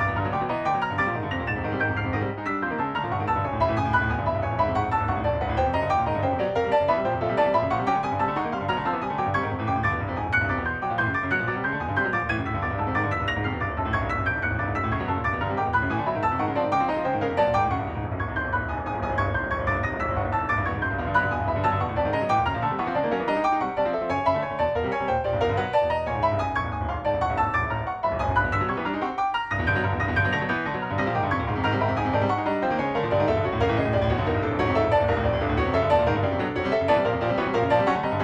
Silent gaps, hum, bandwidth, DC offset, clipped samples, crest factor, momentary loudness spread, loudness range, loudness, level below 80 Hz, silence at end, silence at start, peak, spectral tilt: none; none; 8.2 kHz; under 0.1%; under 0.1%; 16 dB; 5 LU; 3 LU; -25 LUFS; -40 dBFS; 0 s; 0 s; -8 dBFS; -7.5 dB/octave